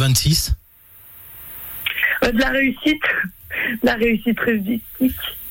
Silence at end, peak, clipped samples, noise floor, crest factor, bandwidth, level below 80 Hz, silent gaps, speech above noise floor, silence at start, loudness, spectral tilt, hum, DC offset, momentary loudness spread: 0 s; -6 dBFS; under 0.1%; -46 dBFS; 14 dB; 17 kHz; -34 dBFS; none; 27 dB; 0 s; -19 LUFS; -4.5 dB/octave; none; under 0.1%; 14 LU